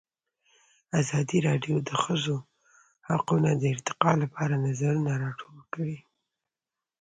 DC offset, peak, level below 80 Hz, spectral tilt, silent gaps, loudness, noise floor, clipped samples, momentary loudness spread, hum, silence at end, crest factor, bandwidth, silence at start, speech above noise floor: under 0.1%; -4 dBFS; -64 dBFS; -6 dB/octave; none; -28 LUFS; under -90 dBFS; under 0.1%; 10 LU; none; 1 s; 24 dB; 9.4 kHz; 0.95 s; over 64 dB